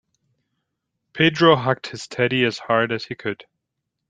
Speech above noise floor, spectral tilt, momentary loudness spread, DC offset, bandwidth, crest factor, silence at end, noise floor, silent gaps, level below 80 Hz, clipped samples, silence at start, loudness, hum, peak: 60 dB; -5.5 dB/octave; 15 LU; under 0.1%; 9.4 kHz; 20 dB; 0.7 s; -80 dBFS; none; -64 dBFS; under 0.1%; 1.15 s; -20 LUFS; none; -2 dBFS